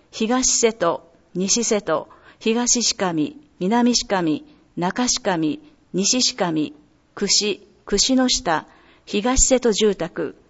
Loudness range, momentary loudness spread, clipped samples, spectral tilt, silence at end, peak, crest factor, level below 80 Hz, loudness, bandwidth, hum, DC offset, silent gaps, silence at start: 2 LU; 11 LU; under 0.1%; -2.5 dB/octave; 0.2 s; -2 dBFS; 18 dB; -38 dBFS; -20 LUFS; 8.2 kHz; none; under 0.1%; none; 0.15 s